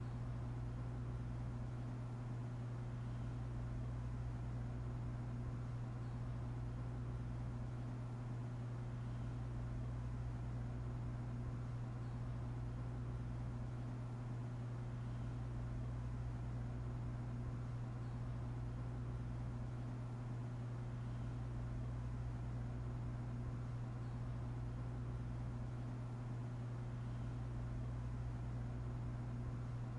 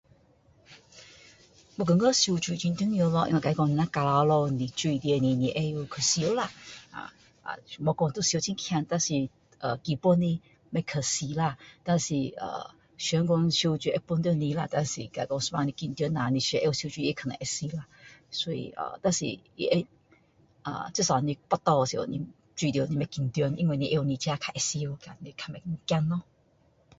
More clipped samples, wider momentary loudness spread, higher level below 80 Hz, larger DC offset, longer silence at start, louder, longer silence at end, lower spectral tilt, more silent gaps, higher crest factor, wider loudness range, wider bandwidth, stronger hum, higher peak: neither; second, 1 LU vs 13 LU; first, -52 dBFS vs -60 dBFS; neither; second, 0 s vs 0.7 s; second, -46 LUFS vs -28 LUFS; second, 0 s vs 0.75 s; first, -8.5 dB/octave vs -5 dB/octave; neither; second, 10 dB vs 20 dB; second, 0 LU vs 4 LU; about the same, 8.8 kHz vs 8 kHz; first, 60 Hz at -45 dBFS vs none; second, -34 dBFS vs -8 dBFS